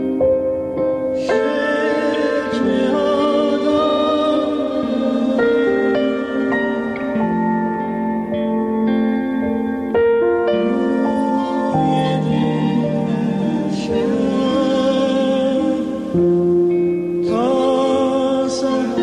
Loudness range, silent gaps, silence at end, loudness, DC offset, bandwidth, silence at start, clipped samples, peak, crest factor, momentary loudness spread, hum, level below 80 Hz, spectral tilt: 2 LU; none; 0 s; -18 LUFS; under 0.1%; 10.5 kHz; 0 s; under 0.1%; -8 dBFS; 10 dB; 4 LU; none; -50 dBFS; -7 dB/octave